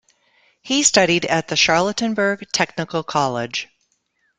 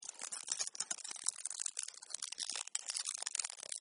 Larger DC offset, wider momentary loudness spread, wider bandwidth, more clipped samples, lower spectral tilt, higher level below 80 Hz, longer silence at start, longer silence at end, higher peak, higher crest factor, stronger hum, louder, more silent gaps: neither; first, 11 LU vs 6 LU; about the same, 11 kHz vs 10.5 kHz; neither; first, -2.5 dB/octave vs 3.5 dB/octave; first, -56 dBFS vs under -90 dBFS; first, 0.65 s vs 0 s; first, 0.75 s vs 0 s; first, 0 dBFS vs -10 dBFS; second, 20 dB vs 32 dB; neither; first, -18 LUFS vs -40 LUFS; neither